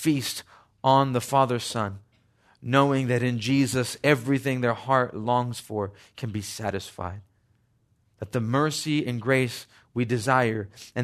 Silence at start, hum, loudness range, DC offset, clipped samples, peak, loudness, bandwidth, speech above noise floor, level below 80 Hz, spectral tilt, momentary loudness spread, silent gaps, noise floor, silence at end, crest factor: 0 s; none; 7 LU; under 0.1%; under 0.1%; -6 dBFS; -25 LUFS; 13.5 kHz; 42 dB; -64 dBFS; -5.5 dB/octave; 13 LU; none; -67 dBFS; 0 s; 20 dB